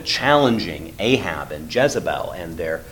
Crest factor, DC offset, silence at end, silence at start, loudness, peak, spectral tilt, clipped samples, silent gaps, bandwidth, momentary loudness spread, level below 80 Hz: 20 dB; under 0.1%; 0 s; 0 s; -21 LUFS; 0 dBFS; -4.5 dB/octave; under 0.1%; none; 19 kHz; 12 LU; -44 dBFS